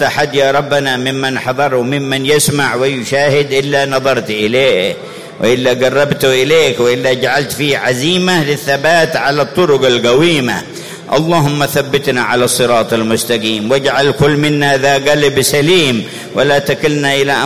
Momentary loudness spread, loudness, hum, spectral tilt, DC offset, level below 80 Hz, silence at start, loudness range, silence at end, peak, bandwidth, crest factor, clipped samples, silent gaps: 5 LU; -12 LUFS; none; -4 dB/octave; 0.8%; -46 dBFS; 0 s; 2 LU; 0 s; 0 dBFS; 16 kHz; 12 dB; under 0.1%; none